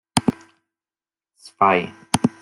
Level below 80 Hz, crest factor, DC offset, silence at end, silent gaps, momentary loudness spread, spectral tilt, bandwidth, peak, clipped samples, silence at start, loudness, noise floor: -56 dBFS; 24 dB; under 0.1%; 0.15 s; none; 7 LU; -4.5 dB/octave; 15.5 kHz; 0 dBFS; under 0.1%; 0.15 s; -21 LUFS; under -90 dBFS